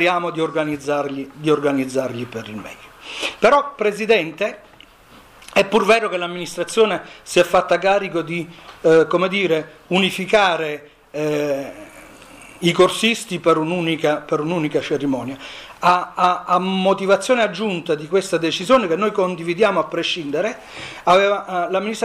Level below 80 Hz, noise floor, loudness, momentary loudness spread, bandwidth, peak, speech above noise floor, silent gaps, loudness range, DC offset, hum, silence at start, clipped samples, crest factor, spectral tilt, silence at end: -56 dBFS; -47 dBFS; -19 LUFS; 12 LU; 15.5 kHz; -4 dBFS; 28 dB; none; 3 LU; under 0.1%; none; 0 s; under 0.1%; 16 dB; -4.5 dB/octave; 0 s